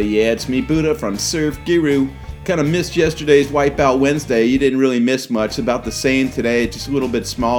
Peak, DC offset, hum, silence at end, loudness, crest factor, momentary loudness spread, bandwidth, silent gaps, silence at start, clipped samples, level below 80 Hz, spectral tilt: 0 dBFS; under 0.1%; none; 0 s; -17 LUFS; 16 dB; 6 LU; 18.5 kHz; none; 0 s; under 0.1%; -36 dBFS; -5 dB/octave